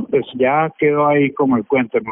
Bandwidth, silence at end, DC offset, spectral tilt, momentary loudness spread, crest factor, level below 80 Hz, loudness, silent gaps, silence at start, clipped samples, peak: 3.9 kHz; 0 s; under 0.1%; -5.5 dB/octave; 3 LU; 12 dB; -58 dBFS; -16 LUFS; none; 0 s; under 0.1%; -4 dBFS